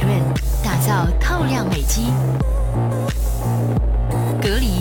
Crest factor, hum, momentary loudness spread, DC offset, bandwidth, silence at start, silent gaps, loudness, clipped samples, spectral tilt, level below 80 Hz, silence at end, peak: 12 dB; none; 3 LU; under 0.1%; 17.5 kHz; 0 s; none; -20 LUFS; under 0.1%; -5.5 dB/octave; -22 dBFS; 0 s; -6 dBFS